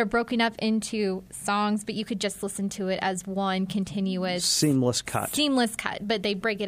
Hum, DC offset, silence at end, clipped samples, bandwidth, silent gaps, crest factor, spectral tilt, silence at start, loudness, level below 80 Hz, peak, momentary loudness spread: none; under 0.1%; 0 s; under 0.1%; 15.5 kHz; none; 18 dB; -4 dB/octave; 0 s; -26 LUFS; -58 dBFS; -8 dBFS; 7 LU